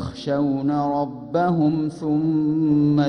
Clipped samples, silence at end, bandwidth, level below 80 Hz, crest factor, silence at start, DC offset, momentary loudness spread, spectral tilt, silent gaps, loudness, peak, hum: under 0.1%; 0 s; 6.4 kHz; -52 dBFS; 12 dB; 0 s; under 0.1%; 6 LU; -9 dB/octave; none; -21 LUFS; -10 dBFS; none